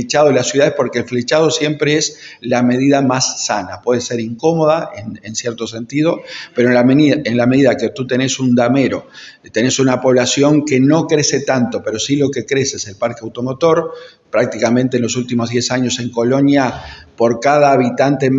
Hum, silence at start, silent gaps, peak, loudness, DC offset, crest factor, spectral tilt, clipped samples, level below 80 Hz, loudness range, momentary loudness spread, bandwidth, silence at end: none; 0 s; none; 0 dBFS; -15 LUFS; under 0.1%; 14 dB; -4.5 dB/octave; under 0.1%; -54 dBFS; 3 LU; 10 LU; 8 kHz; 0 s